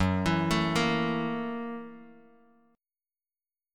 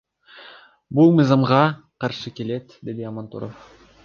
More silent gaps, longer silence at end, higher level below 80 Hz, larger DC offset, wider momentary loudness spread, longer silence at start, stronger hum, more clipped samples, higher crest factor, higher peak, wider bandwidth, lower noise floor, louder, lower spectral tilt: neither; first, 1.6 s vs 0.5 s; first, -52 dBFS vs -60 dBFS; neither; second, 13 LU vs 19 LU; second, 0 s vs 0.35 s; neither; neither; about the same, 18 dB vs 20 dB; second, -12 dBFS vs -2 dBFS; first, 17.5 kHz vs 7 kHz; first, under -90 dBFS vs -47 dBFS; second, -29 LUFS vs -20 LUFS; second, -5.5 dB/octave vs -8 dB/octave